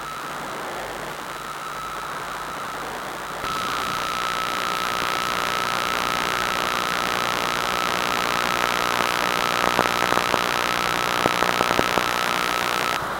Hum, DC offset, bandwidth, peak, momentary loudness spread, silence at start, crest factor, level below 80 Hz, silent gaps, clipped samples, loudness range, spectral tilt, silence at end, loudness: none; under 0.1%; 17 kHz; 0 dBFS; 10 LU; 0 s; 24 dB; -50 dBFS; none; under 0.1%; 8 LU; -2 dB/octave; 0 s; -23 LUFS